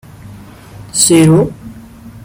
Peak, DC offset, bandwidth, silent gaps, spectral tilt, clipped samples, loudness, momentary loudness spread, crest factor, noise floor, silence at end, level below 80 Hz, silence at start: 0 dBFS; under 0.1%; 17 kHz; none; -4.5 dB/octave; under 0.1%; -10 LUFS; 14 LU; 14 dB; -34 dBFS; 0.05 s; -42 dBFS; 0.25 s